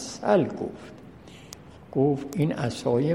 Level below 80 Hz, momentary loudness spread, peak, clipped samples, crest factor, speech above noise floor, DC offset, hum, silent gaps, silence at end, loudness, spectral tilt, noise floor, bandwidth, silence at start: -58 dBFS; 22 LU; -8 dBFS; under 0.1%; 20 dB; 22 dB; under 0.1%; none; none; 0 s; -26 LUFS; -6.5 dB/octave; -46 dBFS; 16 kHz; 0 s